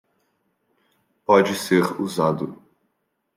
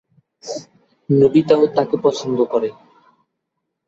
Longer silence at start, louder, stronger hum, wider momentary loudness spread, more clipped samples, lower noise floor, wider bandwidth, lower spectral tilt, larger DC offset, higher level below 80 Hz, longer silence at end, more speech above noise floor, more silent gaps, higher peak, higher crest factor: first, 1.3 s vs 0.45 s; second, -20 LUFS vs -17 LUFS; neither; second, 14 LU vs 17 LU; neither; about the same, -74 dBFS vs -77 dBFS; first, 16.5 kHz vs 7.8 kHz; second, -5.5 dB/octave vs -7 dB/octave; neither; second, -68 dBFS vs -58 dBFS; second, 0.8 s vs 1.15 s; second, 54 dB vs 61 dB; neither; about the same, -2 dBFS vs -2 dBFS; about the same, 22 dB vs 18 dB